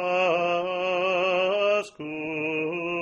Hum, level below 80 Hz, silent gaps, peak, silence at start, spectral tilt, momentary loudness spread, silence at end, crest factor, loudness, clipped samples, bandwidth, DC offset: none; -70 dBFS; none; -12 dBFS; 0 s; -5 dB/octave; 7 LU; 0 s; 14 dB; -25 LUFS; under 0.1%; 9 kHz; under 0.1%